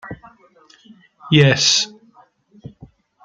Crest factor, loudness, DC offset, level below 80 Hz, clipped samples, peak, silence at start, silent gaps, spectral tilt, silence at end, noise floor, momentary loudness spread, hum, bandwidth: 20 dB; -15 LUFS; under 0.1%; -54 dBFS; under 0.1%; 0 dBFS; 0.05 s; none; -3.5 dB/octave; 1.35 s; -53 dBFS; 24 LU; none; 9.2 kHz